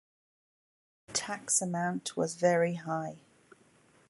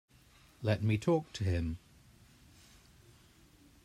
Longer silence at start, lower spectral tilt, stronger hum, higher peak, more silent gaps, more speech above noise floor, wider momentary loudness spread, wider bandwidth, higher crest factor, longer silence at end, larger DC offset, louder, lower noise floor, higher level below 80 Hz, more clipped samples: first, 1.1 s vs 0.6 s; second, -3.5 dB/octave vs -7 dB/octave; neither; about the same, -14 dBFS vs -16 dBFS; neither; about the same, 33 dB vs 31 dB; about the same, 9 LU vs 9 LU; second, 11.5 kHz vs 13 kHz; about the same, 22 dB vs 20 dB; second, 0.9 s vs 2.1 s; neither; first, -31 LUFS vs -34 LUFS; about the same, -64 dBFS vs -63 dBFS; second, -76 dBFS vs -58 dBFS; neither